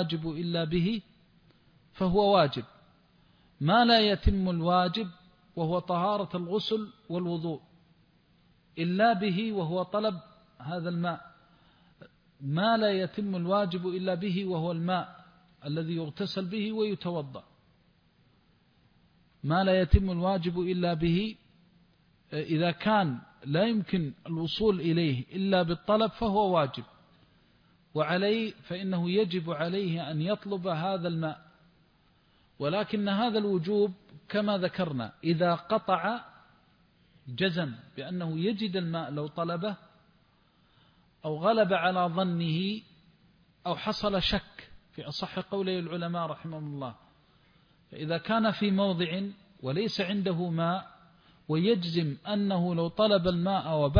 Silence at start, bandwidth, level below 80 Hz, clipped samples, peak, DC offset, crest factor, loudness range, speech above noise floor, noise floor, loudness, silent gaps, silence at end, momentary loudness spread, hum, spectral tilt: 0 s; 5.2 kHz; -46 dBFS; under 0.1%; -8 dBFS; under 0.1%; 22 dB; 6 LU; 37 dB; -65 dBFS; -29 LUFS; none; 0 s; 13 LU; none; -8 dB/octave